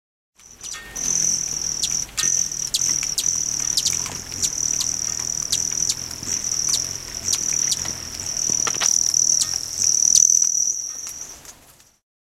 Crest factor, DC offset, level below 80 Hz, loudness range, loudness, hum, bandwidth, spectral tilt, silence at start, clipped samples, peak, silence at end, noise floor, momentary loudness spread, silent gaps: 22 dB; under 0.1%; -50 dBFS; 5 LU; -19 LUFS; none; 17 kHz; 1 dB/octave; 0.45 s; under 0.1%; 0 dBFS; 0.8 s; -51 dBFS; 11 LU; none